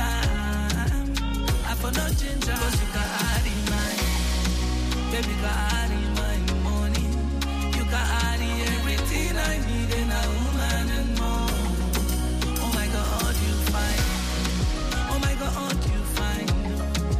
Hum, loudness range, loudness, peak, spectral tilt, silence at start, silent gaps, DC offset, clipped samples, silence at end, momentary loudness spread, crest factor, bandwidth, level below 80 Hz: none; 1 LU; -25 LUFS; -12 dBFS; -4.5 dB/octave; 0 s; none; under 0.1%; under 0.1%; 0 s; 2 LU; 12 dB; 15.5 kHz; -26 dBFS